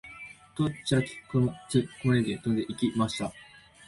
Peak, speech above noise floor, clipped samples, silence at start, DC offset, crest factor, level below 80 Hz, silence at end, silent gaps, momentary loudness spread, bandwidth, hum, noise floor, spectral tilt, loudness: -12 dBFS; 19 dB; under 0.1%; 0.05 s; under 0.1%; 18 dB; -56 dBFS; 0.45 s; none; 10 LU; 11.5 kHz; none; -47 dBFS; -6 dB/octave; -29 LUFS